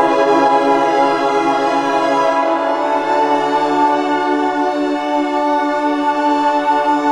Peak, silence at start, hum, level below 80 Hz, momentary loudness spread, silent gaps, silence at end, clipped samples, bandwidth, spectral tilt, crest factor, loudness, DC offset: 0 dBFS; 0 s; none; -58 dBFS; 4 LU; none; 0 s; under 0.1%; 11.5 kHz; -4.5 dB/octave; 14 dB; -15 LUFS; under 0.1%